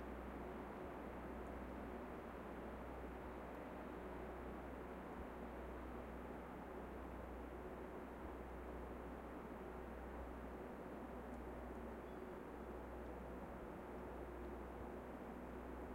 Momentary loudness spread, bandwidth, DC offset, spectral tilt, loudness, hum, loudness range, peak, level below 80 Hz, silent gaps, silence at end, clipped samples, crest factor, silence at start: 1 LU; 16 kHz; under 0.1%; -7.5 dB/octave; -52 LUFS; none; 1 LU; -38 dBFS; -58 dBFS; none; 0 s; under 0.1%; 14 dB; 0 s